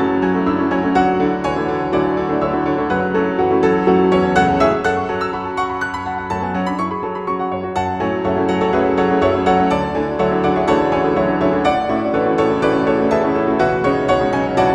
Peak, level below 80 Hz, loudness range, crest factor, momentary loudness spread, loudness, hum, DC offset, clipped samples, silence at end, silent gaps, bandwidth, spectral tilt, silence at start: -2 dBFS; -40 dBFS; 4 LU; 16 dB; 7 LU; -17 LUFS; none; under 0.1%; under 0.1%; 0 s; none; 10.5 kHz; -7 dB/octave; 0 s